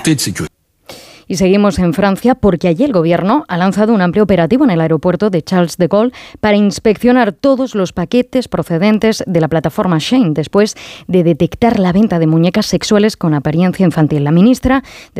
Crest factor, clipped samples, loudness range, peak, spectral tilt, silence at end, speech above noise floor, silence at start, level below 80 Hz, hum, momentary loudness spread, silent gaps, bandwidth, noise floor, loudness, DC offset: 10 dB; under 0.1%; 2 LU; -2 dBFS; -6.5 dB/octave; 0 s; 25 dB; 0 s; -38 dBFS; none; 5 LU; none; 15 kHz; -37 dBFS; -12 LUFS; under 0.1%